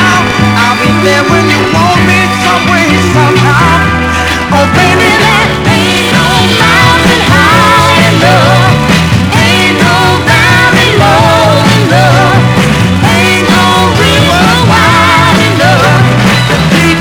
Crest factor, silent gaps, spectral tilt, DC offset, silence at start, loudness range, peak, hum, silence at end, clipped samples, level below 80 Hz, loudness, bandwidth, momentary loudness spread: 6 dB; none; -4.5 dB/octave; under 0.1%; 0 s; 2 LU; 0 dBFS; none; 0 s; 4%; -26 dBFS; -5 LUFS; over 20 kHz; 3 LU